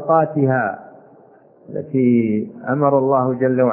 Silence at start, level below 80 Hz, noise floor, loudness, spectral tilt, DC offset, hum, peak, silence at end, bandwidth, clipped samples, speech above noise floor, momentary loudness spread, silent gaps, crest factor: 0 s; -66 dBFS; -48 dBFS; -18 LUFS; -13.5 dB/octave; under 0.1%; none; -2 dBFS; 0 s; 3 kHz; under 0.1%; 32 dB; 11 LU; none; 16 dB